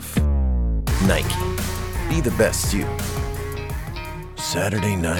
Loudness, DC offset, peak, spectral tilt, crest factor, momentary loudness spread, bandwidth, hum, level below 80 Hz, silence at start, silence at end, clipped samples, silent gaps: -23 LUFS; under 0.1%; -4 dBFS; -5 dB/octave; 18 dB; 10 LU; 19 kHz; none; -26 dBFS; 0 s; 0 s; under 0.1%; none